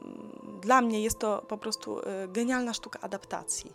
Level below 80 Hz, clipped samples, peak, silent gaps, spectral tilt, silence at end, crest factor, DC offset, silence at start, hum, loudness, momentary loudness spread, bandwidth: -58 dBFS; under 0.1%; -8 dBFS; none; -3 dB/octave; 0 s; 22 dB; under 0.1%; 0 s; none; -30 LUFS; 14 LU; 16 kHz